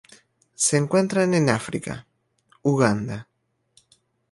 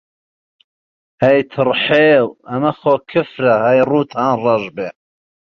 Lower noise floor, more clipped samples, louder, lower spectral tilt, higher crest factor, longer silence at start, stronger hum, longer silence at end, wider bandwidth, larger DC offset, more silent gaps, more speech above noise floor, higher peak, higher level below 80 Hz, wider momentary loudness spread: second, -63 dBFS vs under -90 dBFS; neither; second, -22 LUFS vs -15 LUFS; second, -5 dB/octave vs -7.5 dB/octave; first, 20 dB vs 14 dB; second, 0.6 s vs 1.2 s; neither; first, 1.1 s vs 0.7 s; first, 11.5 kHz vs 6.4 kHz; neither; neither; second, 42 dB vs over 76 dB; about the same, -4 dBFS vs -2 dBFS; about the same, -58 dBFS vs -58 dBFS; first, 14 LU vs 8 LU